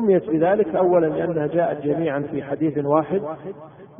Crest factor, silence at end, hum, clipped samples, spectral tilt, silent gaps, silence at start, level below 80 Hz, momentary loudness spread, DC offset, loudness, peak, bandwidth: 16 dB; 0.15 s; none; under 0.1%; -12.5 dB/octave; none; 0 s; -58 dBFS; 11 LU; under 0.1%; -21 LUFS; -6 dBFS; 3.7 kHz